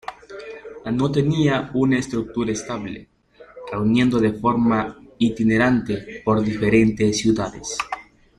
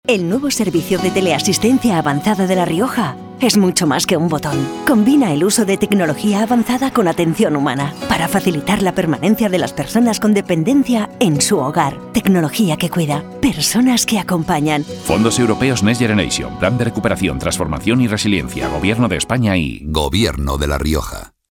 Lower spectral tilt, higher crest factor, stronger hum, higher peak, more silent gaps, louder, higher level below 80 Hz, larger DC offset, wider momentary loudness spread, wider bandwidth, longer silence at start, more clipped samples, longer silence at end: about the same, -6 dB/octave vs -5 dB/octave; about the same, 16 dB vs 14 dB; neither; second, -4 dBFS vs 0 dBFS; neither; second, -21 LUFS vs -16 LUFS; second, -48 dBFS vs -34 dBFS; neither; first, 17 LU vs 5 LU; second, 11 kHz vs 18.5 kHz; about the same, 0.1 s vs 0.05 s; neither; about the same, 0.35 s vs 0.3 s